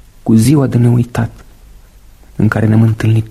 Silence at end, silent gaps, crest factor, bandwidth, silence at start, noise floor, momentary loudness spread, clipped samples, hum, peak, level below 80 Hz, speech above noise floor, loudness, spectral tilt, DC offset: 0 s; none; 12 dB; 13 kHz; 0.25 s; -40 dBFS; 10 LU; under 0.1%; none; 0 dBFS; -36 dBFS; 29 dB; -12 LUFS; -7.5 dB/octave; under 0.1%